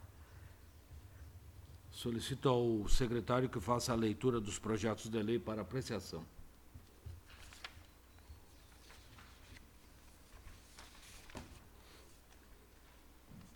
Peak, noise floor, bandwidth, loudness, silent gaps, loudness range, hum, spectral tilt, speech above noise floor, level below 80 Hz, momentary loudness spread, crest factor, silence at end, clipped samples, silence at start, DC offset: -18 dBFS; -62 dBFS; 19 kHz; -38 LUFS; none; 21 LU; none; -5.5 dB/octave; 26 dB; -50 dBFS; 25 LU; 24 dB; 0.1 s; under 0.1%; 0 s; under 0.1%